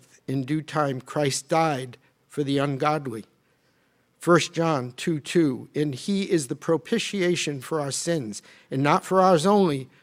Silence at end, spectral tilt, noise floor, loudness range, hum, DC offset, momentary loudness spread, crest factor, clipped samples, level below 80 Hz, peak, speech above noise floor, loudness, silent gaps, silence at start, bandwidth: 0.15 s; -5 dB/octave; -66 dBFS; 3 LU; none; under 0.1%; 11 LU; 20 dB; under 0.1%; -68 dBFS; -4 dBFS; 42 dB; -24 LUFS; none; 0.3 s; 16 kHz